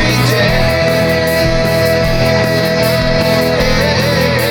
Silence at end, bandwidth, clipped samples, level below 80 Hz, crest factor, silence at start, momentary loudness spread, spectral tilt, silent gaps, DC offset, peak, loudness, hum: 0 s; over 20 kHz; under 0.1%; -24 dBFS; 12 dB; 0 s; 1 LU; -5 dB/octave; none; under 0.1%; 0 dBFS; -12 LUFS; none